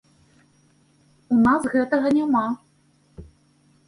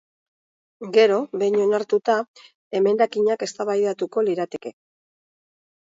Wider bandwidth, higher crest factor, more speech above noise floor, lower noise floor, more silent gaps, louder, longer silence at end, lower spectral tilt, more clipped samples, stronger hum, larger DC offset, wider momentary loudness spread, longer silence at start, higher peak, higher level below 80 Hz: first, 11 kHz vs 7.8 kHz; about the same, 16 dB vs 18 dB; second, 40 dB vs over 69 dB; second, -60 dBFS vs under -90 dBFS; second, none vs 2.28-2.34 s, 2.55-2.71 s; about the same, -21 LUFS vs -21 LUFS; second, 0.65 s vs 1.15 s; first, -6.5 dB/octave vs -5 dB/octave; neither; neither; neither; second, 8 LU vs 12 LU; first, 1.3 s vs 0.8 s; second, -8 dBFS vs -4 dBFS; first, -56 dBFS vs -74 dBFS